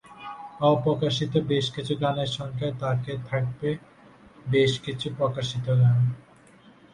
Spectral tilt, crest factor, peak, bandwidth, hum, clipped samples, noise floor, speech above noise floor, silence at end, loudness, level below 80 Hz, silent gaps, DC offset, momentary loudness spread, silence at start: -6.5 dB/octave; 18 dB; -8 dBFS; 10 kHz; none; under 0.1%; -53 dBFS; 29 dB; 0.75 s; -26 LUFS; -58 dBFS; none; under 0.1%; 11 LU; 0.1 s